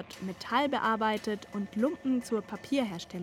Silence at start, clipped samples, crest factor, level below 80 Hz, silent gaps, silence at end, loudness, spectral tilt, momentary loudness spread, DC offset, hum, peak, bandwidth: 0 s; under 0.1%; 18 dB; -66 dBFS; none; 0 s; -31 LUFS; -5 dB/octave; 8 LU; under 0.1%; none; -14 dBFS; 16 kHz